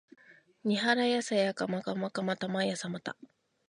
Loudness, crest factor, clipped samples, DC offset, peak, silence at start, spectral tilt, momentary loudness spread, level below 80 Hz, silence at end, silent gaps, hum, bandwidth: -31 LUFS; 20 dB; under 0.1%; under 0.1%; -12 dBFS; 0.3 s; -4.5 dB/octave; 11 LU; -80 dBFS; 0.45 s; none; none; 11 kHz